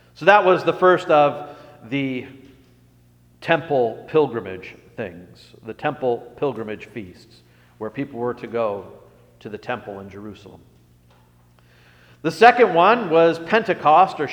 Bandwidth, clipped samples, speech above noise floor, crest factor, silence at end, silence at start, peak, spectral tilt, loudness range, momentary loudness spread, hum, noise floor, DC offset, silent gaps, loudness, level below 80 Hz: 10 kHz; under 0.1%; 34 dB; 20 dB; 0 s; 0.2 s; 0 dBFS; -6 dB/octave; 13 LU; 22 LU; 60 Hz at -55 dBFS; -54 dBFS; under 0.1%; none; -19 LUFS; -62 dBFS